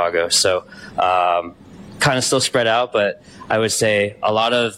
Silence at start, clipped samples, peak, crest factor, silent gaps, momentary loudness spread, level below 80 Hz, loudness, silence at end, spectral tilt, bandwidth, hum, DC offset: 0 s; under 0.1%; -6 dBFS; 14 dB; none; 7 LU; -54 dBFS; -17 LUFS; 0 s; -2.5 dB/octave; 16.5 kHz; none; under 0.1%